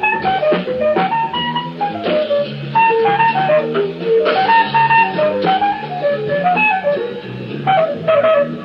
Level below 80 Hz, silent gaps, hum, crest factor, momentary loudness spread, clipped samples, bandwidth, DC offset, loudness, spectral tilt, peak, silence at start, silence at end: -56 dBFS; none; none; 14 dB; 8 LU; under 0.1%; 5.8 kHz; under 0.1%; -15 LUFS; -7.5 dB/octave; 0 dBFS; 0 s; 0 s